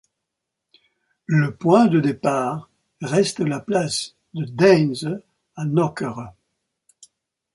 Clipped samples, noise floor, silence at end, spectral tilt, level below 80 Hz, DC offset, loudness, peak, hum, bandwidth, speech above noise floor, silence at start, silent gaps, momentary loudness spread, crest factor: under 0.1%; -82 dBFS; 1.25 s; -6 dB/octave; -62 dBFS; under 0.1%; -20 LUFS; -2 dBFS; none; 11.5 kHz; 62 dB; 1.3 s; none; 18 LU; 20 dB